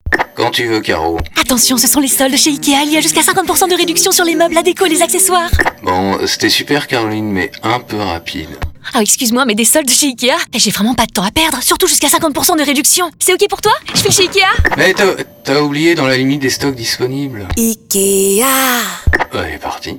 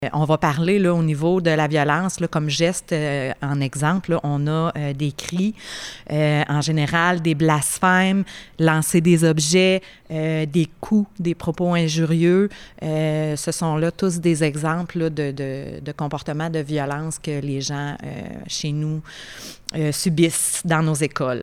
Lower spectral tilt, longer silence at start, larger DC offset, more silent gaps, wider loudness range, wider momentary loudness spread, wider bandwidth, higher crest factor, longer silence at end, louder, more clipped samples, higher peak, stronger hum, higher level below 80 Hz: second, -2.5 dB/octave vs -5 dB/octave; about the same, 0.05 s vs 0 s; neither; neither; second, 4 LU vs 8 LU; second, 8 LU vs 11 LU; first, 20 kHz vs 15.5 kHz; about the same, 12 dB vs 16 dB; about the same, 0 s vs 0 s; first, -11 LUFS vs -21 LUFS; neither; first, 0 dBFS vs -4 dBFS; neither; first, -30 dBFS vs -52 dBFS